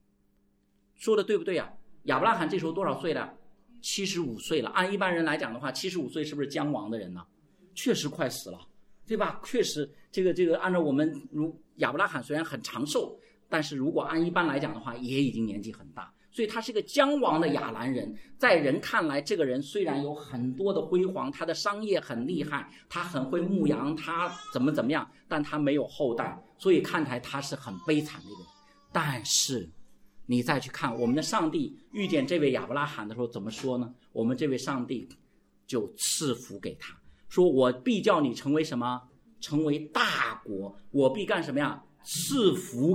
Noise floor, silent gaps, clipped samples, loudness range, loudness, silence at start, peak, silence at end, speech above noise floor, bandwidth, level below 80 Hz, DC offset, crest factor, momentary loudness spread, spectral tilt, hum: -68 dBFS; none; under 0.1%; 4 LU; -29 LUFS; 1 s; -8 dBFS; 0 s; 39 dB; 16.5 kHz; -66 dBFS; under 0.1%; 22 dB; 11 LU; -4.5 dB/octave; none